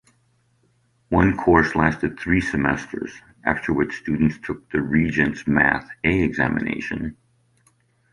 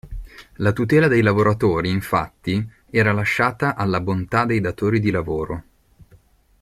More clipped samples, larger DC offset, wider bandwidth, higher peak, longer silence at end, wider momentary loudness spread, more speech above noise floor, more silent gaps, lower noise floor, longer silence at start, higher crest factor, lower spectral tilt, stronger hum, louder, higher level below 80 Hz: neither; neither; second, 11 kHz vs 15 kHz; about the same, -2 dBFS vs -4 dBFS; about the same, 1 s vs 1 s; about the same, 11 LU vs 10 LU; first, 43 dB vs 34 dB; neither; first, -64 dBFS vs -53 dBFS; first, 1.1 s vs 0.05 s; about the same, 20 dB vs 16 dB; about the same, -7.5 dB/octave vs -7.5 dB/octave; neither; about the same, -21 LUFS vs -20 LUFS; about the same, -40 dBFS vs -44 dBFS